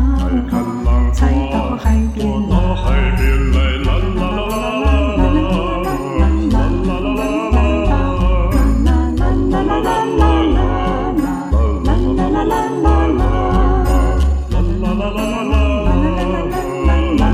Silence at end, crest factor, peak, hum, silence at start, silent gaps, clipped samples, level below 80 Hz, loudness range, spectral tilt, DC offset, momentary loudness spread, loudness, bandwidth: 0 s; 14 dB; 0 dBFS; none; 0 s; none; under 0.1%; -16 dBFS; 1 LU; -7.5 dB/octave; under 0.1%; 4 LU; -16 LUFS; 13.5 kHz